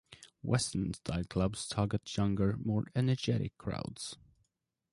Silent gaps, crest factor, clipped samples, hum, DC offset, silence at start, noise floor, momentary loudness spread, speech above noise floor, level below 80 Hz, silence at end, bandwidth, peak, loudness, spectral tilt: none; 18 dB; under 0.1%; none; under 0.1%; 0.1 s; -82 dBFS; 10 LU; 49 dB; -52 dBFS; 0.8 s; 11.5 kHz; -16 dBFS; -35 LUFS; -6 dB/octave